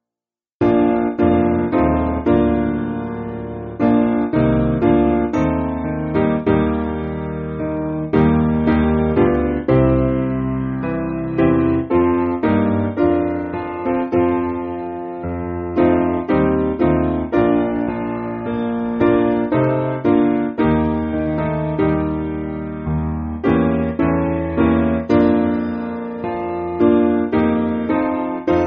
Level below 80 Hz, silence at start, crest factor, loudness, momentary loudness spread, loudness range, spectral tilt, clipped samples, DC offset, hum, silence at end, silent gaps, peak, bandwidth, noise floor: -34 dBFS; 0.6 s; 16 dB; -18 LUFS; 9 LU; 2 LU; -8 dB/octave; under 0.1%; under 0.1%; none; 0 s; none; -2 dBFS; 5.2 kHz; under -90 dBFS